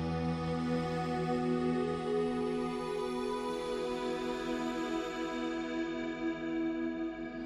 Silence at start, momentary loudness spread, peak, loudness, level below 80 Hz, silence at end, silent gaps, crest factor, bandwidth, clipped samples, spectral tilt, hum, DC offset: 0 s; 4 LU; -22 dBFS; -35 LUFS; -56 dBFS; 0 s; none; 14 dB; 12.5 kHz; under 0.1%; -6.5 dB/octave; none; under 0.1%